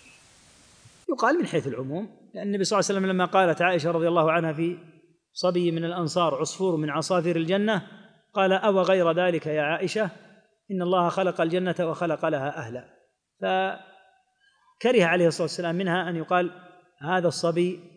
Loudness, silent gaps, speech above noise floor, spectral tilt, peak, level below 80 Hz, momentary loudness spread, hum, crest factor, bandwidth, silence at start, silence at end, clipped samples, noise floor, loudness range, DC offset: -25 LUFS; none; 41 dB; -5.5 dB/octave; -6 dBFS; -76 dBFS; 11 LU; none; 18 dB; 10.5 kHz; 1.1 s; 0.1 s; under 0.1%; -65 dBFS; 3 LU; under 0.1%